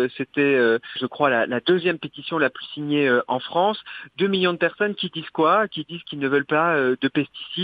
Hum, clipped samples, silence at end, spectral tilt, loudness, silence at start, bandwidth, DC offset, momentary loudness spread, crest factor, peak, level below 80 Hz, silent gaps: none; under 0.1%; 0 s; -8 dB/octave; -22 LUFS; 0 s; 5 kHz; under 0.1%; 10 LU; 18 dB; -4 dBFS; -70 dBFS; none